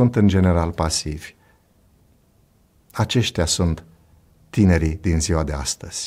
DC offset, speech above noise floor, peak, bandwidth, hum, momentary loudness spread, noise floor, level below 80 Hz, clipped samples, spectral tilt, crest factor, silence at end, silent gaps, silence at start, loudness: under 0.1%; 39 dB; -4 dBFS; 15 kHz; none; 14 LU; -58 dBFS; -34 dBFS; under 0.1%; -5 dB/octave; 18 dB; 0 s; none; 0 s; -20 LUFS